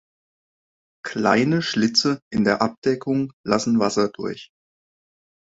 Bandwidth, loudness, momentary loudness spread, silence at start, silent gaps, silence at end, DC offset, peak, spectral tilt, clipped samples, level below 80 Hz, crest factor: 8 kHz; -21 LUFS; 12 LU; 1.05 s; 2.22-2.31 s, 2.78-2.82 s, 3.33-3.44 s; 1.15 s; under 0.1%; -2 dBFS; -5 dB/octave; under 0.1%; -58 dBFS; 20 dB